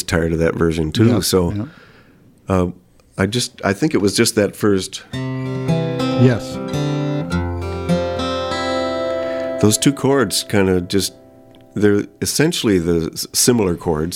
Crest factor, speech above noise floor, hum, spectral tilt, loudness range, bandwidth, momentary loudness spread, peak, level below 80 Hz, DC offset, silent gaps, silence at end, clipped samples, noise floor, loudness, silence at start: 18 dB; 32 dB; none; -5 dB/octave; 2 LU; 17 kHz; 9 LU; 0 dBFS; -40 dBFS; under 0.1%; none; 0 s; under 0.1%; -48 dBFS; -18 LUFS; 0 s